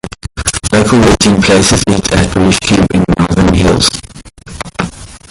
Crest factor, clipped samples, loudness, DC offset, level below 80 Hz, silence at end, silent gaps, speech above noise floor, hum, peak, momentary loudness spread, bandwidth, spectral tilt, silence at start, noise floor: 10 dB; under 0.1%; -9 LUFS; under 0.1%; -24 dBFS; 0.15 s; none; 23 dB; none; 0 dBFS; 14 LU; 16 kHz; -4.5 dB/octave; 0.05 s; -32 dBFS